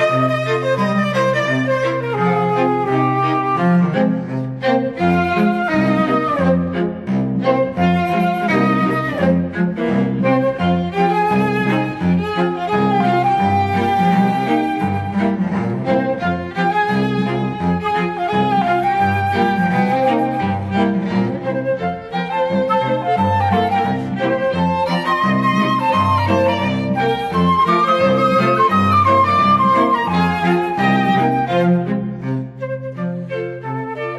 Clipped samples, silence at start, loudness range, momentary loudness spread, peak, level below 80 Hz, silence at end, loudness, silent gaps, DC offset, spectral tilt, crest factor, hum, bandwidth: under 0.1%; 0 s; 4 LU; 6 LU; -2 dBFS; -48 dBFS; 0 s; -17 LUFS; none; under 0.1%; -7.5 dB/octave; 14 dB; none; 12.5 kHz